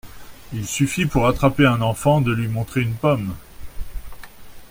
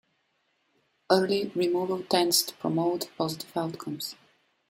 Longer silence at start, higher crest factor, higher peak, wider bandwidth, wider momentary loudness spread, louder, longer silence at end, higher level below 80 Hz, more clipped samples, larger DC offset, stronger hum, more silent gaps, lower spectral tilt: second, 0.05 s vs 1.1 s; about the same, 18 dB vs 22 dB; first, -2 dBFS vs -6 dBFS; about the same, 16.5 kHz vs 16 kHz; first, 21 LU vs 11 LU; first, -20 LUFS vs -27 LUFS; second, 0.05 s vs 0.55 s; first, -36 dBFS vs -72 dBFS; neither; neither; neither; neither; first, -6 dB/octave vs -4 dB/octave